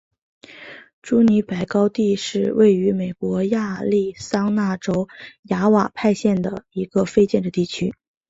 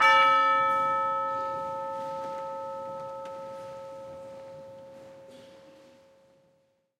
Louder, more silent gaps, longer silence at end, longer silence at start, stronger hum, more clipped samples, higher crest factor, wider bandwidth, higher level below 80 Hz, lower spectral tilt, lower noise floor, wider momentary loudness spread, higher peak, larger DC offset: first, -20 LUFS vs -27 LUFS; first, 0.93-1.02 s, 5.39-5.43 s vs none; second, 0.4 s vs 1.3 s; first, 0.5 s vs 0 s; neither; neither; about the same, 16 dB vs 20 dB; second, 8 kHz vs 13 kHz; first, -56 dBFS vs -76 dBFS; first, -6.5 dB/octave vs -3 dB/octave; second, -41 dBFS vs -70 dBFS; second, 12 LU vs 25 LU; first, -4 dBFS vs -10 dBFS; neither